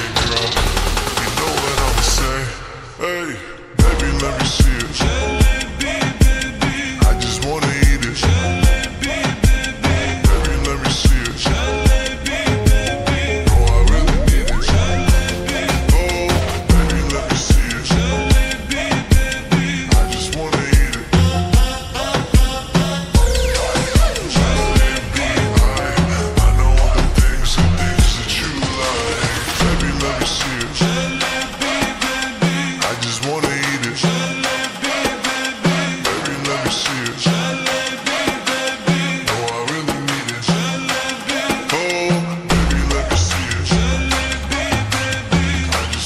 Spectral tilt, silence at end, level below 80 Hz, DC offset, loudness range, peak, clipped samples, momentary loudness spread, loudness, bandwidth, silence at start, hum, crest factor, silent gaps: -4.5 dB/octave; 0 s; -20 dBFS; under 0.1%; 2 LU; -2 dBFS; under 0.1%; 4 LU; -17 LUFS; 15.5 kHz; 0 s; none; 14 dB; none